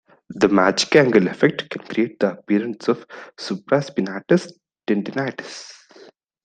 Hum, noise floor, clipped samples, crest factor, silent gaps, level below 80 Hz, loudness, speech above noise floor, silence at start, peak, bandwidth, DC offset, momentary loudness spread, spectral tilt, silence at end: none; -49 dBFS; under 0.1%; 20 dB; none; -64 dBFS; -20 LUFS; 29 dB; 0.3 s; -2 dBFS; 9.4 kHz; under 0.1%; 19 LU; -5.5 dB/octave; 0.75 s